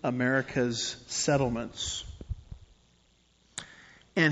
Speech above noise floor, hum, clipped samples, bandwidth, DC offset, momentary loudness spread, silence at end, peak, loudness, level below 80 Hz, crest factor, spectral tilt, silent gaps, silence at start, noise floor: 36 dB; none; under 0.1%; 8 kHz; under 0.1%; 16 LU; 0 s; -10 dBFS; -30 LUFS; -50 dBFS; 20 dB; -4 dB/octave; none; 0.05 s; -66 dBFS